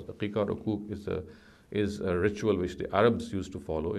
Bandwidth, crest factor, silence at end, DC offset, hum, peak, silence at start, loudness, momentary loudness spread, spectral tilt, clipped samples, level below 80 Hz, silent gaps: 12.5 kHz; 20 dB; 0 s; under 0.1%; none; -10 dBFS; 0 s; -31 LUFS; 11 LU; -7 dB/octave; under 0.1%; -50 dBFS; none